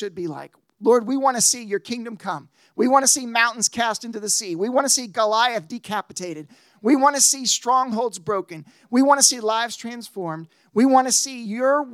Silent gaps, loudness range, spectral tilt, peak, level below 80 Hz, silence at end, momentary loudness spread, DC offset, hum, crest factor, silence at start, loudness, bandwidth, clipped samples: none; 2 LU; -1.5 dB/octave; 0 dBFS; -76 dBFS; 0 s; 16 LU; under 0.1%; none; 22 dB; 0 s; -19 LUFS; 16 kHz; under 0.1%